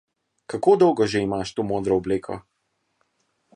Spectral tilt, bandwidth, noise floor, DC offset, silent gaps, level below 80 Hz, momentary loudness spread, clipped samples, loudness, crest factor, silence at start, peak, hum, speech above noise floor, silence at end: -6 dB/octave; 10.5 kHz; -73 dBFS; under 0.1%; none; -54 dBFS; 16 LU; under 0.1%; -22 LUFS; 18 dB; 0.5 s; -4 dBFS; none; 52 dB; 1.15 s